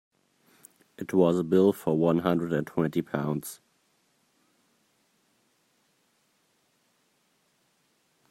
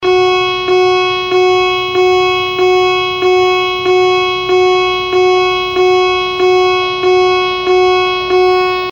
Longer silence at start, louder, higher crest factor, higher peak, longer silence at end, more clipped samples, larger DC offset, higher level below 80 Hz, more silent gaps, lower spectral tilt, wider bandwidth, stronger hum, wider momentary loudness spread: first, 1 s vs 0 s; second, -26 LUFS vs -11 LUFS; first, 22 dB vs 10 dB; second, -10 dBFS vs -2 dBFS; first, 4.75 s vs 0 s; neither; neither; second, -68 dBFS vs -44 dBFS; neither; first, -7.5 dB/octave vs -4 dB/octave; about the same, 16 kHz vs 17 kHz; neither; first, 13 LU vs 2 LU